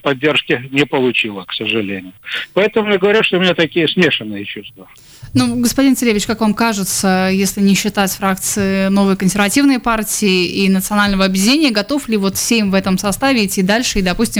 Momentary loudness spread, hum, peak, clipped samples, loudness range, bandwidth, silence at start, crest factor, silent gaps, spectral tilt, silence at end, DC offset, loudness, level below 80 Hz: 6 LU; none; -2 dBFS; under 0.1%; 2 LU; over 20 kHz; 0.05 s; 12 dB; none; -4 dB/octave; 0 s; under 0.1%; -14 LUFS; -38 dBFS